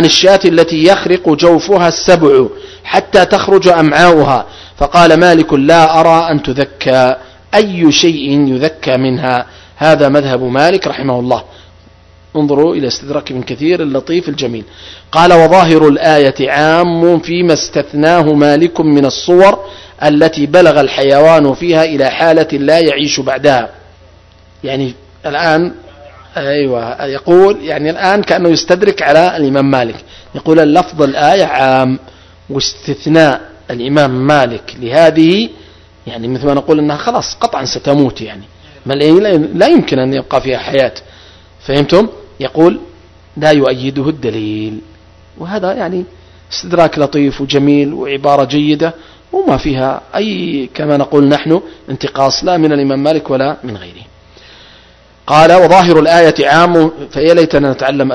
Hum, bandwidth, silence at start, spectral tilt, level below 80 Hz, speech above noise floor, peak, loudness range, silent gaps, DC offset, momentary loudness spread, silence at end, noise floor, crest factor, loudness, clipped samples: none; 11 kHz; 0 s; -5.5 dB/octave; -40 dBFS; 33 dB; 0 dBFS; 6 LU; none; under 0.1%; 13 LU; 0 s; -42 dBFS; 10 dB; -10 LUFS; 2%